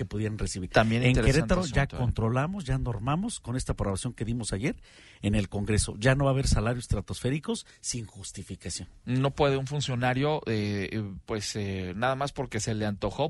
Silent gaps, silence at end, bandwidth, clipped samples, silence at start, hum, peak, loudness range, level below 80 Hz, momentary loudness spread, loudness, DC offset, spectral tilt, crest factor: none; 0 s; 11.5 kHz; under 0.1%; 0 s; none; -8 dBFS; 4 LU; -40 dBFS; 10 LU; -29 LUFS; under 0.1%; -5.5 dB/octave; 20 dB